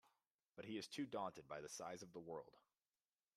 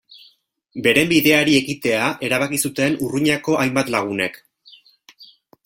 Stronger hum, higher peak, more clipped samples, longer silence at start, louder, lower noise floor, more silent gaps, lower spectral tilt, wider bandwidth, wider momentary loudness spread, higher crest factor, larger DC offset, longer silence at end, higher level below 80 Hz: neither; second, -34 dBFS vs 0 dBFS; neither; about the same, 0.05 s vs 0.15 s; second, -52 LUFS vs -18 LUFS; first, under -90 dBFS vs -56 dBFS; first, 0.31-0.39 s vs none; about the same, -4 dB/octave vs -4 dB/octave; about the same, 15 kHz vs 16.5 kHz; first, 10 LU vs 7 LU; about the same, 20 dB vs 20 dB; neither; first, 0.75 s vs 0.4 s; second, -88 dBFS vs -56 dBFS